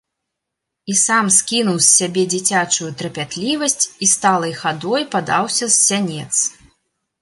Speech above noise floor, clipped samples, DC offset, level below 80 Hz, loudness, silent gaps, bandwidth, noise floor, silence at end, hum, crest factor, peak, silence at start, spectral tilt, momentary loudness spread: 62 dB; under 0.1%; under 0.1%; -62 dBFS; -15 LUFS; none; 12 kHz; -80 dBFS; 0.7 s; none; 18 dB; 0 dBFS; 0.85 s; -2 dB/octave; 10 LU